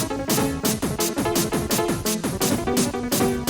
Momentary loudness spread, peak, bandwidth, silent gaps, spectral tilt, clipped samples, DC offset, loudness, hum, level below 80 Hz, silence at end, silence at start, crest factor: 2 LU; -8 dBFS; over 20 kHz; none; -4 dB/octave; under 0.1%; under 0.1%; -23 LUFS; none; -42 dBFS; 0 s; 0 s; 14 dB